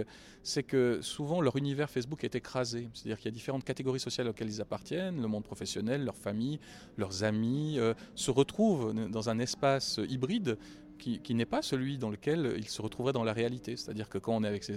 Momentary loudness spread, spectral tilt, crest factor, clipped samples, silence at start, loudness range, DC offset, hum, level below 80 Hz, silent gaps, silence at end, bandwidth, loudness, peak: 9 LU; -5.5 dB/octave; 20 dB; under 0.1%; 0 s; 5 LU; under 0.1%; none; -62 dBFS; none; 0 s; 15 kHz; -34 LUFS; -14 dBFS